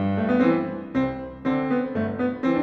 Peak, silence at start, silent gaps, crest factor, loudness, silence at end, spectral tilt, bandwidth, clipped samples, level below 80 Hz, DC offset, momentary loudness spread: -8 dBFS; 0 s; none; 14 dB; -24 LUFS; 0 s; -9 dB/octave; 6 kHz; under 0.1%; -52 dBFS; under 0.1%; 7 LU